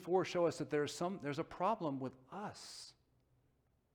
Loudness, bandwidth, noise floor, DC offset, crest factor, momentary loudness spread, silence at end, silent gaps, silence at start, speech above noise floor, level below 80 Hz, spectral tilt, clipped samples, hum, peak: -40 LUFS; 17.5 kHz; -77 dBFS; under 0.1%; 18 dB; 14 LU; 1.05 s; none; 0 s; 38 dB; -76 dBFS; -5.5 dB/octave; under 0.1%; none; -22 dBFS